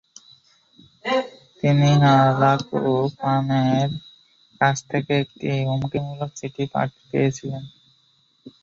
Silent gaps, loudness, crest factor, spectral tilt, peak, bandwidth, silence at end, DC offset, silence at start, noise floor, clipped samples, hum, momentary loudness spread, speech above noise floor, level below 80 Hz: none; -21 LUFS; 18 dB; -6.5 dB/octave; -4 dBFS; 7.4 kHz; 0.15 s; under 0.1%; 1.05 s; -62 dBFS; under 0.1%; none; 15 LU; 42 dB; -56 dBFS